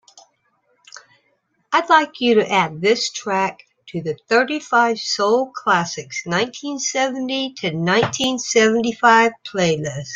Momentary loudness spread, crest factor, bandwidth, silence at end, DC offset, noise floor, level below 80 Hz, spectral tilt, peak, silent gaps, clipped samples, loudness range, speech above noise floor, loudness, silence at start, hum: 9 LU; 18 dB; 9.4 kHz; 0 s; under 0.1%; -66 dBFS; -62 dBFS; -3.5 dB/octave; -2 dBFS; none; under 0.1%; 2 LU; 47 dB; -18 LUFS; 1.7 s; none